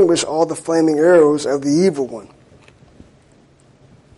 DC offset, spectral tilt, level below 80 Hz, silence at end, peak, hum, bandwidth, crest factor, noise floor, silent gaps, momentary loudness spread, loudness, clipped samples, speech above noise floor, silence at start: under 0.1%; -5 dB/octave; -58 dBFS; 1.95 s; -2 dBFS; none; 11.5 kHz; 14 dB; -51 dBFS; none; 13 LU; -15 LUFS; under 0.1%; 36 dB; 0 s